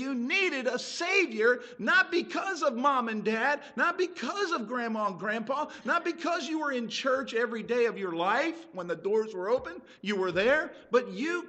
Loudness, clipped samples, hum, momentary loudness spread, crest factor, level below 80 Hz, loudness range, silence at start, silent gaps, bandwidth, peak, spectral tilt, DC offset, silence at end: -29 LUFS; under 0.1%; none; 7 LU; 16 dB; -70 dBFS; 3 LU; 0 s; none; 8.8 kHz; -12 dBFS; -4 dB/octave; under 0.1%; 0 s